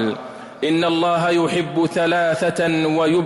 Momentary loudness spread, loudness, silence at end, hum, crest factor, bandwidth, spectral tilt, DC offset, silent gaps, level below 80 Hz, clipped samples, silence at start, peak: 7 LU; -19 LUFS; 0 s; none; 8 dB; 12 kHz; -5.5 dB/octave; under 0.1%; none; -58 dBFS; under 0.1%; 0 s; -10 dBFS